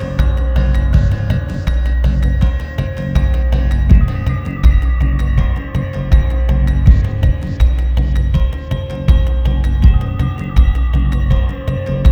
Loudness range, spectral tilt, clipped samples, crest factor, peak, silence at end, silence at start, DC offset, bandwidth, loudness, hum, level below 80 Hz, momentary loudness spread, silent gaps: 1 LU; -8 dB/octave; 0.4%; 12 dB; 0 dBFS; 0 s; 0 s; under 0.1%; 6.2 kHz; -15 LUFS; none; -14 dBFS; 7 LU; none